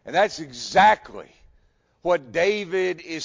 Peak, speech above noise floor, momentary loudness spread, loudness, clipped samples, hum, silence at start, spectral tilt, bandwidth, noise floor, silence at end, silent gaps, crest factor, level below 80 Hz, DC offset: -4 dBFS; 40 dB; 15 LU; -22 LUFS; under 0.1%; none; 0.05 s; -3.5 dB/octave; 7.6 kHz; -62 dBFS; 0 s; none; 18 dB; -58 dBFS; under 0.1%